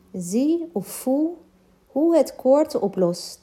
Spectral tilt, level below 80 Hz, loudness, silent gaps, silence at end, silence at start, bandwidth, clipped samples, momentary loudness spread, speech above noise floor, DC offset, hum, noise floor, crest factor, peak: -6 dB/octave; -66 dBFS; -22 LUFS; none; 0.05 s; 0.15 s; 16 kHz; under 0.1%; 9 LU; 35 dB; under 0.1%; none; -56 dBFS; 16 dB; -6 dBFS